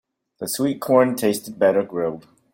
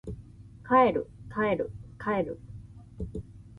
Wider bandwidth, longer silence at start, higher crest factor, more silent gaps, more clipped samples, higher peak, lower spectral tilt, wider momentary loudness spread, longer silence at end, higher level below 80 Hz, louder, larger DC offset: first, 17 kHz vs 10.5 kHz; first, 0.4 s vs 0.05 s; about the same, 18 dB vs 20 dB; neither; neither; first, -2 dBFS vs -10 dBFS; second, -5 dB/octave vs -8.5 dB/octave; second, 10 LU vs 24 LU; first, 0.35 s vs 0 s; second, -64 dBFS vs -50 dBFS; first, -21 LUFS vs -29 LUFS; neither